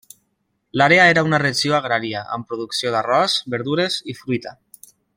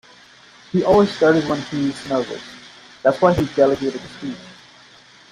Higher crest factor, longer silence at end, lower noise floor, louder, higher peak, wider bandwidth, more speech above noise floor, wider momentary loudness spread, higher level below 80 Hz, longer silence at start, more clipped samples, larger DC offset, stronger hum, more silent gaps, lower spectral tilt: about the same, 18 dB vs 18 dB; second, 0.65 s vs 0.8 s; first, -70 dBFS vs -47 dBFS; about the same, -18 LUFS vs -19 LUFS; about the same, -2 dBFS vs -2 dBFS; first, 16.5 kHz vs 12 kHz; first, 52 dB vs 29 dB; about the same, 15 LU vs 16 LU; second, -60 dBFS vs -48 dBFS; about the same, 0.75 s vs 0.75 s; neither; neither; neither; neither; second, -4 dB/octave vs -6.5 dB/octave